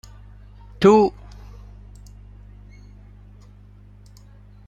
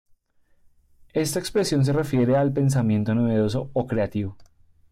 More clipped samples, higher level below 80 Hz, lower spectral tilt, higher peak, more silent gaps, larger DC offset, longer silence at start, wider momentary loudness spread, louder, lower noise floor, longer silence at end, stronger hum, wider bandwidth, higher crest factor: neither; first, -44 dBFS vs -52 dBFS; about the same, -7 dB/octave vs -6.5 dB/octave; first, -2 dBFS vs -12 dBFS; neither; neither; second, 0.8 s vs 1.15 s; first, 29 LU vs 7 LU; first, -17 LUFS vs -23 LUFS; second, -46 dBFS vs -61 dBFS; first, 3.6 s vs 0.5 s; first, 50 Hz at -45 dBFS vs none; second, 8.4 kHz vs 16 kHz; first, 22 dB vs 12 dB